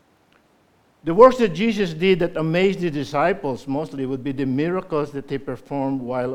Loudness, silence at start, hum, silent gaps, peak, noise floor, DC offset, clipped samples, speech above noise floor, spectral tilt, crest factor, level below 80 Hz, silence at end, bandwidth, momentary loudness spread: -21 LUFS; 1.05 s; none; none; 0 dBFS; -59 dBFS; under 0.1%; under 0.1%; 39 dB; -7 dB/octave; 20 dB; -50 dBFS; 0 s; 12 kHz; 14 LU